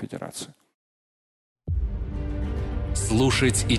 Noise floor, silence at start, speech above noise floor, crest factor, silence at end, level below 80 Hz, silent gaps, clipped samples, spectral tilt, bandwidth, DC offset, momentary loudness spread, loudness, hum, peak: under -90 dBFS; 0 s; over 67 dB; 18 dB; 0 s; -32 dBFS; 0.74-1.56 s; under 0.1%; -4.5 dB/octave; 12.5 kHz; under 0.1%; 16 LU; -26 LUFS; none; -8 dBFS